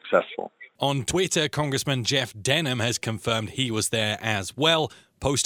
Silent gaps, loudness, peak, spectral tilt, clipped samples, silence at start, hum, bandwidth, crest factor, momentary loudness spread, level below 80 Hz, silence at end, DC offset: none; -25 LUFS; -4 dBFS; -3.5 dB/octave; under 0.1%; 0.05 s; none; 19 kHz; 20 dB; 6 LU; -52 dBFS; 0 s; under 0.1%